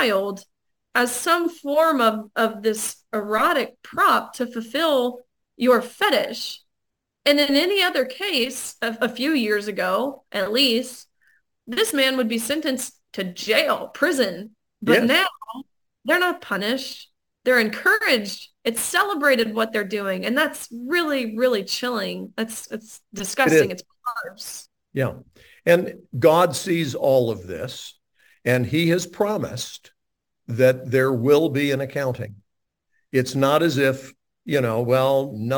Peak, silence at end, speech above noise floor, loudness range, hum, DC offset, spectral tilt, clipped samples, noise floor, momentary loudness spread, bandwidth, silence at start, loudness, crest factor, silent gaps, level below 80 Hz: -2 dBFS; 0 s; 60 dB; 3 LU; none; under 0.1%; -4 dB/octave; under 0.1%; -82 dBFS; 14 LU; 19 kHz; 0 s; -21 LUFS; 20 dB; none; -64 dBFS